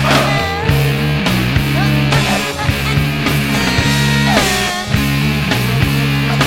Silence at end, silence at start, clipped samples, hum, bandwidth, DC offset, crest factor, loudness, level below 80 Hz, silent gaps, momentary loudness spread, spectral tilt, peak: 0 s; 0 s; under 0.1%; none; 17 kHz; under 0.1%; 14 dB; -14 LUFS; -28 dBFS; none; 3 LU; -5 dB/octave; 0 dBFS